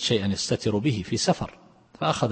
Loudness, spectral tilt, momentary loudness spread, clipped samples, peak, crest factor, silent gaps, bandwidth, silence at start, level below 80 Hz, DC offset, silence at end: -26 LUFS; -4.5 dB/octave; 5 LU; under 0.1%; -8 dBFS; 18 dB; none; 8.8 kHz; 0 s; -54 dBFS; under 0.1%; 0 s